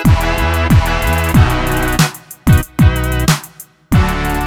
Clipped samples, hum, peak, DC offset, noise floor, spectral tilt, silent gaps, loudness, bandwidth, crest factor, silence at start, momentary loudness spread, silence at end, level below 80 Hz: under 0.1%; none; 0 dBFS; under 0.1%; -37 dBFS; -5.5 dB/octave; none; -14 LUFS; 18.5 kHz; 12 dB; 0 s; 4 LU; 0 s; -18 dBFS